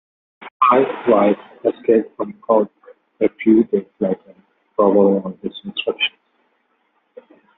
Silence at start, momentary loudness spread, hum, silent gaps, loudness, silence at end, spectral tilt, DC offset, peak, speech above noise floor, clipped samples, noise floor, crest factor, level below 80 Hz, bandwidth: 0.4 s; 13 LU; none; 0.51-0.60 s; -18 LUFS; 1.5 s; -4 dB/octave; under 0.1%; -2 dBFS; 48 dB; under 0.1%; -65 dBFS; 16 dB; -62 dBFS; 4 kHz